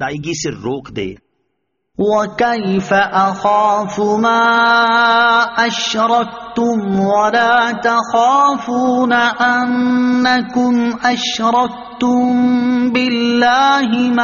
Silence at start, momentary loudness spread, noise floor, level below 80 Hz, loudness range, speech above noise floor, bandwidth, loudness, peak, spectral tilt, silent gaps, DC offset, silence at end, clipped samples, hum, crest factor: 0 s; 9 LU; -70 dBFS; -52 dBFS; 3 LU; 56 dB; 7.2 kHz; -14 LUFS; 0 dBFS; -2.5 dB/octave; none; under 0.1%; 0 s; under 0.1%; none; 14 dB